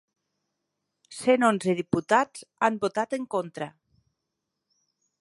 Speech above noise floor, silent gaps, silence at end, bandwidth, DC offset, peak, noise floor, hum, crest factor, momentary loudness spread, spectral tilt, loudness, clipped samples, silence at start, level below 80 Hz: 58 dB; none; 1.5 s; 11.5 kHz; under 0.1%; -6 dBFS; -83 dBFS; none; 22 dB; 15 LU; -5 dB/octave; -26 LUFS; under 0.1%; 1.1 s; -68 dBFS